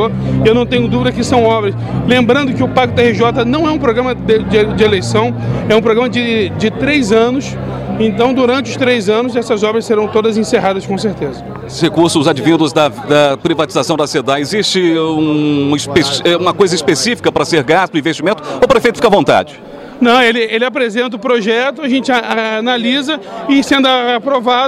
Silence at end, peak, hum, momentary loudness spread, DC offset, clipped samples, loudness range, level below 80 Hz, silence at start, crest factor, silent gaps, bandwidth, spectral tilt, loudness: 0 s; 0 dBFS; none; 6 LU; under 0.1%; under 0.1%; 2 LU; -38 dBFS; 0 s; 12 dB; none; 13.5 kHz; -5 dB/octave; -12 LUFS